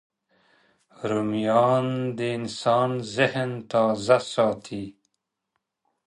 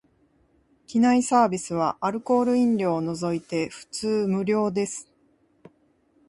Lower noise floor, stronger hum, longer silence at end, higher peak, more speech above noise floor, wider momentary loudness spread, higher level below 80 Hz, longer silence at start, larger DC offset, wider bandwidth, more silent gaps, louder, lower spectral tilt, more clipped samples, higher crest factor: first, -79 dBFS vs -64 dBFS; neither; about the same, 1.15 s vs 1.25 s; about the same, -4 dBFS vs -6 dBFS; first, 56 dB vs 41 dB; first, 12 LU vs 9 LU; about the same, -66 dBFS vs -64 dBFS; about the same, 1 s vs 0.9 s; neither; about the same, 11 kHz vs 11.5 kHz; neither; about the same, -24 LUFS vs -24 LUFS; about the same, -6 dB/octave vs -5.5 dB/octave; neither; about the same, 22 dB vs 18 dB